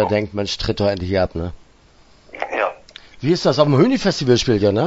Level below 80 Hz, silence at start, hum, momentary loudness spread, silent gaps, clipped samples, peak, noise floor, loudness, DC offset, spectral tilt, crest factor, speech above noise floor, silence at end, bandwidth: -40 dBFS; 0 s; none; 12 LU; none; under 0.1%; 0 dBFS; -50 dBFS; -18 LUFS; under 0.1%; -6 dB/octave; 18 dB; 33 dB; 0 s; 8 kHz